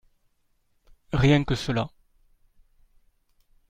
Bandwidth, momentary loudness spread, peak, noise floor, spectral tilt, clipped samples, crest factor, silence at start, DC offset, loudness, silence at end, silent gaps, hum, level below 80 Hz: 10.5 kHz; 10 LU; -8 dBFS; -69 dBFS; -6.5 dB/octave; under 0.1%; 22 dB; 1.1 s; under 0.1%; -24 LUFS; 1.8 s; none; none; -44 dBFS